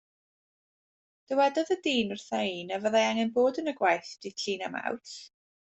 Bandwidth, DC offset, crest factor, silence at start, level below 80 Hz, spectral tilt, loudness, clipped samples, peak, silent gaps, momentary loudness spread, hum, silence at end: 8.2 kHz; under 0.1%; 20 dB; 1.3 s; -72 dBFS; -3.5 dB/octave; -29 LUFS; under 0.1%; -12 dBFS; none; 10 LU; none; 0.5 s